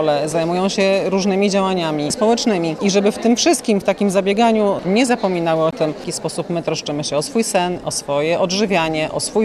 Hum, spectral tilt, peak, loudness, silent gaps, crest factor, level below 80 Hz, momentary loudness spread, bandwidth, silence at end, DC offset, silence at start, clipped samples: none; -4.5 dB/octave; -2 dBFS; -17 LUFS; none; 14 dB; -52 dBFS; 6 LU; 13.5 kHz; 0 s; under 0.1%; 0 s; under 0.1%